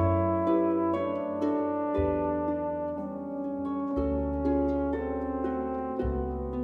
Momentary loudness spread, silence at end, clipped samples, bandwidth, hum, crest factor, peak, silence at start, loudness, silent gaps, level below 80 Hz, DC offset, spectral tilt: 7 LU; 0 s; under 0.1%; 4.5 kHz; none; 14 dB; -14 dBFS; 0 s; -30 LUFS; none; -42 dBFS; under 0.1%; -10.5 dB/octave